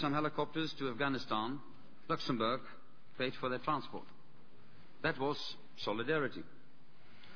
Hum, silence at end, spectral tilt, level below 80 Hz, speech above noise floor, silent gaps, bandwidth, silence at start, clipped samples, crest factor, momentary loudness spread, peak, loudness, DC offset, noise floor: none; 0 s; -3.5 dB/octave; -70 dBFS; 27 dB; none; 5.4 kHz; 0 s; under 0.1%; 20 dB; 14 LU; -20 dBFS; -38 LUFS; 0.6%; -65 dBFS